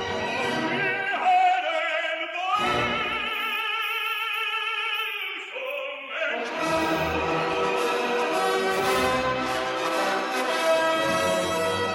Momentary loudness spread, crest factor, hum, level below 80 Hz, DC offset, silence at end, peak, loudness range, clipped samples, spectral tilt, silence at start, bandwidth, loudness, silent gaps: 6 LU; 14 dB; none; -54 dBFS; under 0.1%; 0 s; -12 dBFS; 3 LU; under 0.1%; -3 dB/octave; 0 s; 16 kHz; -25 LUFS; none